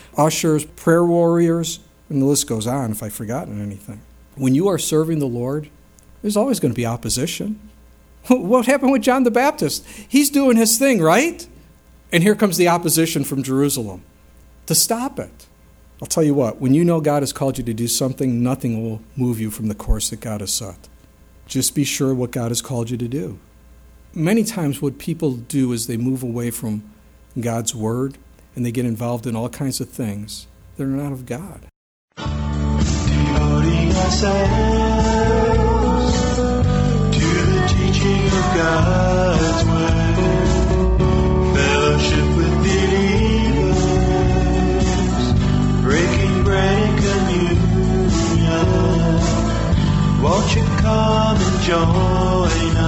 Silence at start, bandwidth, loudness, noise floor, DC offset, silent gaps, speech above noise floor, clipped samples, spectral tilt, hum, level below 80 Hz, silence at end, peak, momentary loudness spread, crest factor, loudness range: 0.15 s; 19.5 kHz; -18 LUFS; -48 dBFS; under 0.1%; 31.76-32.08 s; 29 dB; under 0.1%; -5.5 dB/octave; none; -26 dBFS; 0 s; 0 dBFS; 11 LU; 18 dB; 7 LU